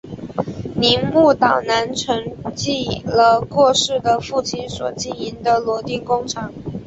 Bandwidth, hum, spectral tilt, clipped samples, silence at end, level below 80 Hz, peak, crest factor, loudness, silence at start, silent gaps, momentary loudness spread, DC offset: 8.2 kHz; none; -4 dB/octave; under 0.1%; 0 s; -46 dBFS; -2 dBFS; 18 dB; -18 LUFS; 0.05 s; none; 12 LU; under 0.1%